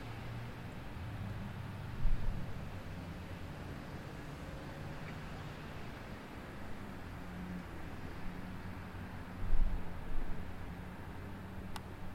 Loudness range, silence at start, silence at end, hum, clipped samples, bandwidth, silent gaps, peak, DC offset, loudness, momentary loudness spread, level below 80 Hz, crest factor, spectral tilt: 3 LU; 0 s; 0 s; none; under 0.1%; 12 kHz; none; -18 dBFS; under 0.1%; -46 LUFS; 6 LU; -42 dBFS; 20 dB; -6.5 dB/octave